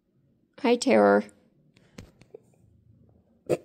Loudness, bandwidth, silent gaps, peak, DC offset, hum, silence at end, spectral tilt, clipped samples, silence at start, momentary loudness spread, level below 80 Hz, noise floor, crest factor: -23 LUFS; 10.5 kHz; none; -8 dBFS; under 0.1%; none; 0.05 s; -5 dB/octave; under 0.1%; 0.65 s; 23 LU; -66 dBFS; -67 dBFS; 20 dB